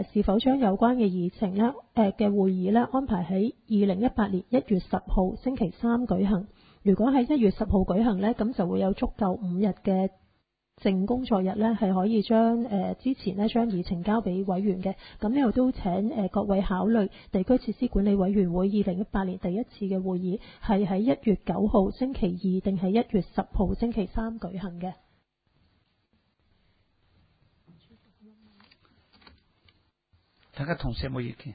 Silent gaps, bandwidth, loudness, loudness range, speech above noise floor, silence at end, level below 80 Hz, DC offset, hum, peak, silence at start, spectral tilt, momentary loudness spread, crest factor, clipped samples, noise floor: none; 5 kHz; -26 LUFS; 7 LU; 47 dB; 0 s; -42 dBFS; under 0.1%; none; -10 dBFS; 0 s; -12 dB/octave; 8 LU; 16 dB; under 0.1%; -72 dBFS